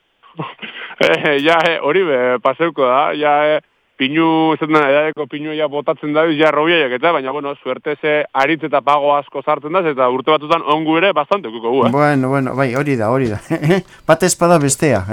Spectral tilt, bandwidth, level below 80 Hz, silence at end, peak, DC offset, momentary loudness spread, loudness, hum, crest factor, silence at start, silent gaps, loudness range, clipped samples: -4.5 dB/octave; 17.5 kHz; -54 dBFS; 0 s; 0 dBFS; under 0.1%; 8 LU; -15 LUFS; none; 14 dB; 0.4 s; none; 2 LU; under 0.1%